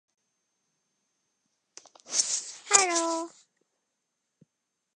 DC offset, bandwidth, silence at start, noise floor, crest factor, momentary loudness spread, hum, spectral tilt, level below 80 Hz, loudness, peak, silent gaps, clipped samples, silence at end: under 0.1%; 11.5 kHz; 2.1 s; -82 dBFS; 30 dB; 12 LU; none; 1 dB/octave; -90 dBFS; -25 LUFS; -2 dBFS; none; under 0.1%; 1.65 s